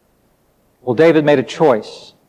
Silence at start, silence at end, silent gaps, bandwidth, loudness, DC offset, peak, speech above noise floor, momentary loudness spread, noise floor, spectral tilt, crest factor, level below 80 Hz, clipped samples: 0.85 s; 0.3 s; none; 9.8 kHz; -14 LUFS; under 0.1%; -2 dBFS; 45 dB; 15 LU; -58 dBFS; -6.5 dB/octave; 14 dB; -64 dBFS; under 0.1%